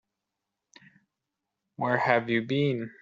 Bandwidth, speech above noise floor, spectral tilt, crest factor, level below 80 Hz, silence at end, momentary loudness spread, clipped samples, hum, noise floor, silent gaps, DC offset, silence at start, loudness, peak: 7.4 kHz; 59 dB; -4.5 dB/octave; 22 dB; -72 dBFS; 0.1 s; 5 LU; under 0.1%; none; -86 dBFS; none; under 0.1%; 1.8 s; -27 LUFS; -8 dBFS